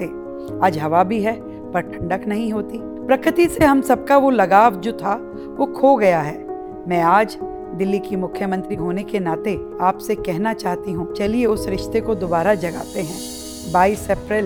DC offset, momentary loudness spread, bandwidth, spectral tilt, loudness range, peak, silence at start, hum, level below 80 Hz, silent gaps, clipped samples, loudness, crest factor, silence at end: under 0.1%; 14 LU; over 20 kHz; -6 dB/octave; 6 LU; 0 dBFS; 0 s; none; -44 dBFS; none; under 0.1%; -19 LUFS; 18 dB; 0 s